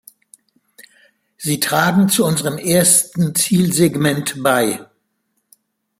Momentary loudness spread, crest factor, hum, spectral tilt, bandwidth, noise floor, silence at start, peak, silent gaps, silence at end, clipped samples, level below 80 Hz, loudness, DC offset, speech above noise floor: 8 LU; 18 dB; none; -4 dB/octave; 16.5 kHz; -69 dBFS; 1.4 s; 0 dBFS; none; 1.15 s; under 0.1%; -56 dBFS; -15 LUFS; under 0.1%; 54 dB